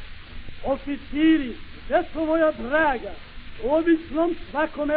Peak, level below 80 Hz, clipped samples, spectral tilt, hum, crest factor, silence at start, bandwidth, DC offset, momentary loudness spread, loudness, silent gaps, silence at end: -8 dBFS; -40 dBFS; under 0.1%; -3.5 dB/octave; none; 16 dB; 0 s; 4.8 kHz; under 0.1%; 21 LU; -24 LUFS; none; 0 s